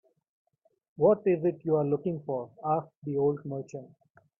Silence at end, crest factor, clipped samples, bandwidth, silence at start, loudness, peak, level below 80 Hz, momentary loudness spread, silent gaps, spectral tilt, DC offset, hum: 0.55 s; 18 dB; under 0.1%; 7.2 kHz; 1 s; -29 LUFS; -12 dBFS; -70 dBFS; 13 LU; 2.97-3.02 s; -10.5 dB/octave; under 0.1%; none